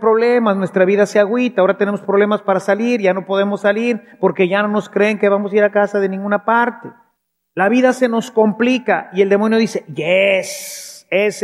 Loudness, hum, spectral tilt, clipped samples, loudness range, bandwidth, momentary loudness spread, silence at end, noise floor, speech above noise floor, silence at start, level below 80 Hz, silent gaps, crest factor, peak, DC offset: -15 LUFS; none; -5.5 dB/octave; under 0.1%; 1 LU; 15 kHz; 6 LU; 0 s; -67 dBFS; 52 dB; 0 s; -76 dBFS; none; 14 dB; 0 dBFS; under 0.1%